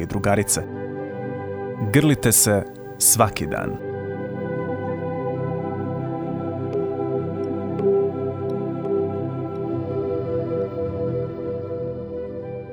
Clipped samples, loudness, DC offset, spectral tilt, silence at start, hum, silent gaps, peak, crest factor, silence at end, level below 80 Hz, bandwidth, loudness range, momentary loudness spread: under 0.1%; -23 LUFS; under 0.1%; -4.5 dB/octave; 0 s; none; none; -2 dBFS; 20 dB; 0 s; -48 dBFS; over 20 kHz; 7 LU; 13 LU